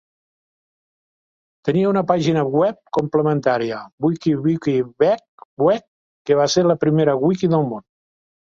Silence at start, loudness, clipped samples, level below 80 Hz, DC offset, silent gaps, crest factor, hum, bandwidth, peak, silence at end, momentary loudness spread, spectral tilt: 1.65 s; -19 LUFS; under 0.1%; -60 dBFS; under 0.1%; 3.92-3.98 s, 5.28-5.38 s, 5.45-5.57 s, 5.88-6.25 s; 16 dB; none; 7.6 kHz; -2 dBFS; 0.65 s; 7 LU; -6.5 dB/octave